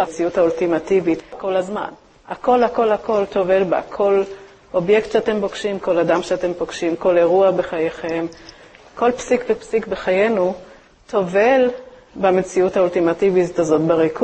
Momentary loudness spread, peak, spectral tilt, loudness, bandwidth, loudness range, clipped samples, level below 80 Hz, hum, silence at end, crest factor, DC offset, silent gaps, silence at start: 8 LU; -2 dBFS; -6 dB/octave; -18 LUFS; 8.6 kHz; 2 LU; under 0.1%; -52 dBFS; none; 0 s; 16 dB; under 0.1%; none; 0 s